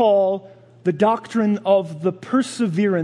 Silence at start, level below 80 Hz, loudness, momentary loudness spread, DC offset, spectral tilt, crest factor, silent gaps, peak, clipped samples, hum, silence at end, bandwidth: 0 s; -72 dBFS; -20 LUFS; 7 LU; under 0.1%; -6.5 dB/octave; 14 dB; none; -4 dBFS; under 0.1%; none; 0 s; 11.5 kHz